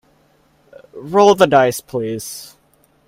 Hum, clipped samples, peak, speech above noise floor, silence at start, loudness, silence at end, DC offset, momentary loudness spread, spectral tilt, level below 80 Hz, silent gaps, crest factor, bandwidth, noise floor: none; under 0.1%; 0 dBFS; 42 dB; 0.95 s; -15 LUFS; 0.65 s; under 0.1%; 20 LU; -4.5 dB/octave; -56 dBFS; none; 18 dB; 16 kHz; -57 dBFS